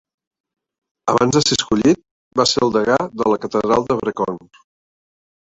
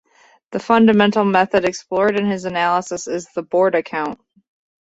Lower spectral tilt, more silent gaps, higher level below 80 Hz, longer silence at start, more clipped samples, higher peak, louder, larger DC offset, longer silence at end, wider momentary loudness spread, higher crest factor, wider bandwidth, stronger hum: second, -4 dB/octave vs -5.5 dB/octave; first, 2.11-2.31 s vs none; first, -50 dBFS vs -58 dBFS; first, 1.05 s vs 0.5 s; neither; about the same, -2 dBFS vs -2 dBFS; about the same, -18 LUFS vs -17 LUFS; neither; first, 1.1 s vs 0.7 s; second, 9 LU vs 13 LU; about the same, 18 dB vs 16 dB; about the same, 8.4 kHz vs 8 kHz; neither